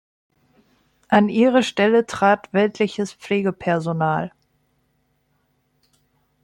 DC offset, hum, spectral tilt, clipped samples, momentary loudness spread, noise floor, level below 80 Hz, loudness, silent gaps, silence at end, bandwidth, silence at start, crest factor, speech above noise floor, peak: under 0.1%; 50 Hz at -65 dBFS; -6 dB/octave; under 0.1%; 7 LU; -67 dBFS; -62 dBFS; -19 LUFS; none; 2.15 s; 11 kHz; 1.1 s; 20 dB; 48 dB; -2 dBFS